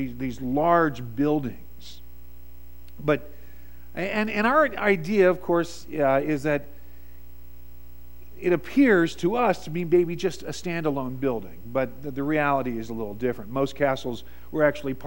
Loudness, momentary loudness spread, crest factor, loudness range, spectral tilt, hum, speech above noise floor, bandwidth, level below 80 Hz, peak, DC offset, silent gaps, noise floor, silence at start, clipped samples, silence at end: -25 LUFS; 12 LU; 20 dB; 5 LU; -6.5 dB/octave; none; 23 dB; 16.5 kHz; -48 dBFS; -6 dBFS; 1%; none; -48 dBFS; 0 s; under 0.1%; 0 s